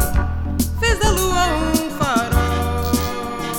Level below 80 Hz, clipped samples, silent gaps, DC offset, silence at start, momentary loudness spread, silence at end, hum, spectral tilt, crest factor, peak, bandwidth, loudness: -24 dBFS; under 0.1%; none; under 0.1%; 0 s; 5 LU; 0 s; none; -4.5 dB/octave; 16 dB; -4 dBFS; 18.5 kHz; -19 LUFS